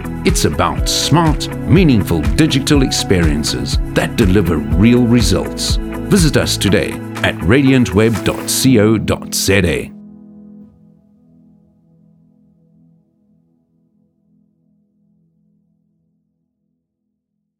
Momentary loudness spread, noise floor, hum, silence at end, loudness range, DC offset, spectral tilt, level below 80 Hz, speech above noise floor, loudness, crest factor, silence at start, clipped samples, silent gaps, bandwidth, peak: 7 LU; -73 dBFS; none; 6.95 s; 5 LU; under 0.1%; -5 dB/octave; -26 dBFS; 60 dB; -14 LUFS; 16 dB; 0 s; under 0.1%; none; 17.5 kHz; 0 dBFS